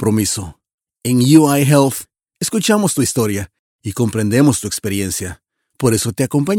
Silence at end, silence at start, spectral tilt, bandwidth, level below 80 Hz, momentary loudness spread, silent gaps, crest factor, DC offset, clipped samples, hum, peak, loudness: 0 s; 0 s; -5 dB/octave; 18 kHz; -48 dBFS; 15 LU; 0.74-0.78 s, 3.59-3.79 s; 16 dB; under 0.1%; under 0.1%; none; 0 dBFS; -16 LUFS